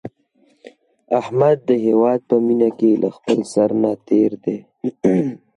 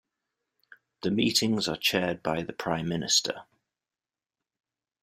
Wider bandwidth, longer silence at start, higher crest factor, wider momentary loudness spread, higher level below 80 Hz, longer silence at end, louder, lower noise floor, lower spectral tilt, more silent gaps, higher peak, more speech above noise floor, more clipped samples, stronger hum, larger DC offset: second, 11 kHz vs 16 kHz; second, 0.05 s vs 1.05 s; second, 14 dB vs 22 dB; about the same, 9 LU vs 9 LU; about the same, -62 dBFS vs -64 dBFS; second, 0.2 s vs 1.6 s; first, -18 LUFS vs -27 LUFS; second, -59 dBFS vs under -90 dBFS; first, -7.5 dB/octave vs -3 dB/octave; neither; first, -4 dBFS vs -10 dBFS; second, 42 dB vs over 62 dB; neither; neither; neither